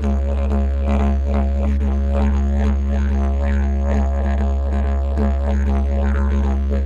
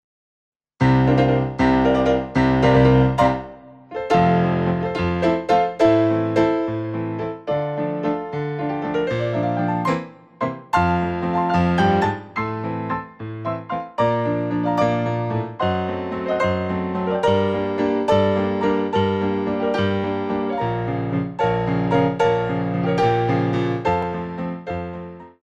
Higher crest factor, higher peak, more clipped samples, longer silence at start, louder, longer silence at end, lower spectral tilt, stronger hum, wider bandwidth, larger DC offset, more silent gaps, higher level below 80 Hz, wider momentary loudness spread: second, 10 dB vs 16 dB; second, -8 dBFS vs -4 dBFS; neither; second, 0 s vs 0.8 s; about the same, -20 LUFS vs -21 LUFS; second, 0 s vs 0.15 s; about the same, -9 dB/octave vs -8 dB/octave; neither; second, 7 kHz vs 8.6 kHz; neither; neither; first, -18 dBFS vs -42 dBFS; second, 2 LU vs 11 LU